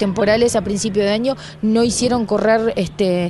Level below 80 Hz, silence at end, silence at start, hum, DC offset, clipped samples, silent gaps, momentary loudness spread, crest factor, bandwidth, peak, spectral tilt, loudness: -42 dBFS; 0 s; 0 s; none; under 0.1%; under 0.1%; none; 5 LU; 14 dB; 11.5 kHz; -4 dBFS; -5 dB/octave; -17 LUFS